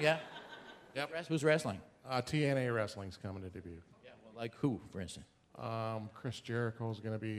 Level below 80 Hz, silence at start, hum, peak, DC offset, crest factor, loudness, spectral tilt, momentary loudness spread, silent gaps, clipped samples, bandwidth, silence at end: -68 dBFS; 0 s; none; -14 dBFS; under 0.1%; 24 dB; -38 LUFS; -6 dB/octave; 19 LU; none; under 0.1%; 14.5 kHz; 0 s